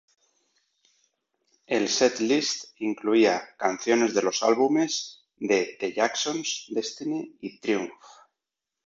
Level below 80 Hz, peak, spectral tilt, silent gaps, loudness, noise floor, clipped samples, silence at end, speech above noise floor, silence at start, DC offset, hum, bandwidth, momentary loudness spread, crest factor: -74 dBFS; -8 dBFS; -3 dB/octave; none; -25 LUFS; -87 dBFS; under 0.1%; 0.95 s; 62 dB; 1.7 s; under 0.1%; none; 7.8 kHz; 10 LU; 20 dB